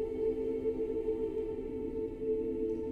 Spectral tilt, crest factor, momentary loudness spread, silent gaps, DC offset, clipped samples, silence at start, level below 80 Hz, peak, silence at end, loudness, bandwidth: -9 dB/octave; 12 dB; 4 LU; none; under 0.1%; under 0.1%; 0 s; -50 dBFS; -22 dBFS; 0 s; -35 LUFS; 4.3 kHz